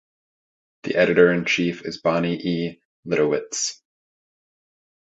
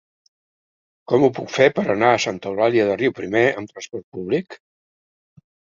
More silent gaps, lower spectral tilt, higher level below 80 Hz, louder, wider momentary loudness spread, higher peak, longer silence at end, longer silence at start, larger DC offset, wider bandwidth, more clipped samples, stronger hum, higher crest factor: first, 2.85-3.03 s vs 4.04-4.12 s; about the same, -4.5 dB/octave vs -5.5 dB/octave; about the same, -60 dBFS vs -60 dBFS; about the same, -21 LUFS vs -19 LUFS; second, 11 LU vs 14 LU; about the same, -2 dBFS vs -2 dBFS; about the same, 1.3 s vs 1.2 s; second, 0.85 s vs 1.1 s; neither; about the same, 8 kHz vs 7.6 kHz; neither; neither; about the same, 22 dB vs 20 dB